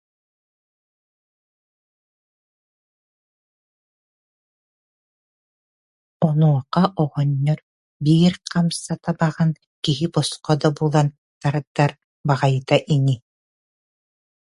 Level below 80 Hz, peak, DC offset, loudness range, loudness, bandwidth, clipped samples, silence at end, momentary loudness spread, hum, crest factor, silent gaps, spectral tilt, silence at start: -58 dBFS; 0 dBFS; under 0.1%; 3 LU; -21 LUFS; 11.5 kHz; under 0.1%; 1.3 s; 8 LU; none; 22 dB; 7.63-8.00 s, 9.67-9.82 s, 11.18-11.41 s, 11.67-11.75 s, 12.04-12.24 s; -6.5 dB/octave; 6.2 s